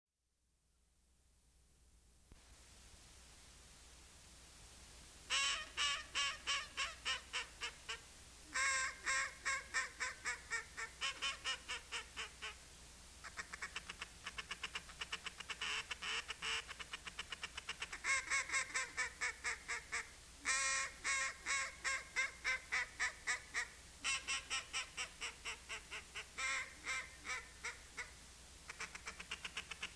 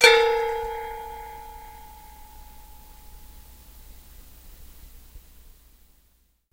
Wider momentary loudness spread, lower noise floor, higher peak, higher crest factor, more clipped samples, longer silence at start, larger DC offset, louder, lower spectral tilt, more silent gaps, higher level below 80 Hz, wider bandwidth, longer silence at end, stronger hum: second, 20 LU vs 25 LU; first, -83 dBFS vs -64 dBFS; second, -22 dBFS vs 0 dBFS; second, 22 dB vs 28 dB; neither; first, 1.85 s vs 0 s; neither; second, -42 LUFS vs -24 LUFS; about the same, 0.5 dB/octave vs -0.5 dB/octave; neither; second, -66 dBFS vs -48 dBFS; second, 11 kHz vs 16 kHz; second, 0 s vs 1.35 s; neither